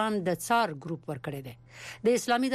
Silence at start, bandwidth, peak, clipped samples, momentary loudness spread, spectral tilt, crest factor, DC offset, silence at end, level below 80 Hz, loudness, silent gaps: 0 s; 15.5 kHz; -16 dBFS; under 0.1%; 17 LU; -4.5 dB/octave; 14 dB; under 0.1%; 0 s; -66 dBFS; -29 LUFS; none